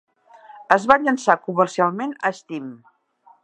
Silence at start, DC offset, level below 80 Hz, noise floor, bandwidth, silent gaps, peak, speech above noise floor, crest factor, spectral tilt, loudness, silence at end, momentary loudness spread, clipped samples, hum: 0.5 s; under 0.1%; -62 dBFS; -56 dBFS; 9.8 kHz; none; 0 dBFS; 36 dB; 22 dB; -5 dB/octave; -19 LUFS; 0.7 s; 16 LU; under 0.1%; none